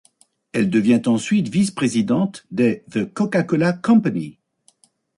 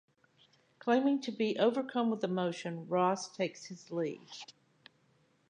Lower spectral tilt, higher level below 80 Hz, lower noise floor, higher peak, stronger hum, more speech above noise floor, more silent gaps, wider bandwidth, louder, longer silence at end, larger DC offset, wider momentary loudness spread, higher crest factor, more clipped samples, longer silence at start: about the same, -6.5 dB/octave vs -5.5 dB/octave; first, -60 dBFS vs -88 dBFS; second, -59 dBFS vs -71 dBFS; first, -4 dBFS vs -16 dBFS; neither; about the same, 40 dB vs 38 dB; neither; first, 11.5 kHz vs 10 kHz; first, -19 LUFS vs -33 LUFS; second, 0.85 s vs 1 s; neither; second, 8 LU vs 17 LU; about the same, 16 dB vs 18 dB; neither; second, 0.55 s vs 0.85 s